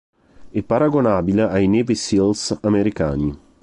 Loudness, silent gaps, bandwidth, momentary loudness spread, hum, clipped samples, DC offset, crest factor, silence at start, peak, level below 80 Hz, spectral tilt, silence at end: -19 LUFS; none; 11 kHz; 7 LU; none; under 0.1%; under 0.1%; 14 dB; 0.4 s; -6 dBFS; -40 dBFS; -6 dB/octave; 0.25 s